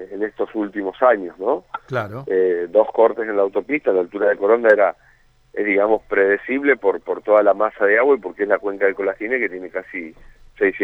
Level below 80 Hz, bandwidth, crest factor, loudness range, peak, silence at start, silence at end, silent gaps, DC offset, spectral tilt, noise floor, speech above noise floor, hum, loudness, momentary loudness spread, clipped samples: -56 dBFS; 4.9 kHz; 18 dB; 2 LU; -2 dBFS; 0 s; 0 s; none; under 0.1%; -8 dB/octave; -49 dBFS; 31 dB; none; -19 LUFS; 11 LU; under 0.1%